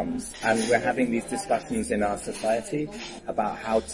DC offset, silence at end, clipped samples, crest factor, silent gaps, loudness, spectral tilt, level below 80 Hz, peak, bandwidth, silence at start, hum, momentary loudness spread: under 0.1%; 0 s; under 0.1%; 20 dB; none; -27 LUFS; -4.5 dB/octave; -50 dBFS; -8 dBFS; 11.5 kHz; 0 s; none; 8 LU